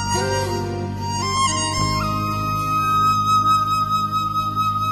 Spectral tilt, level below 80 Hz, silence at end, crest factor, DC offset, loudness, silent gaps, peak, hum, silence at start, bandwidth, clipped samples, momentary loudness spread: -4 dB/octave; -40 dBFS; 0 s; 12 dB; under 0.1%; -20 LUFS; none; -8 dBFS; none; 0 s; 13 kHz; under 0.1%; 8 LU